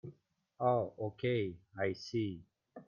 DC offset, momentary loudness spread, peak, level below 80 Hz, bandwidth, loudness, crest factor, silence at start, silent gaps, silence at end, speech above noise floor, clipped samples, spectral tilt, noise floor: under 0.1%; 9 LU; -20 dBFS; -72 dBFS; 7.2 kHz; -37 LUFS; 18 dB; 0.05 s; none; 0.05 s; 31 dB; under 0.1%; -7 dB/octave; -67 dBFS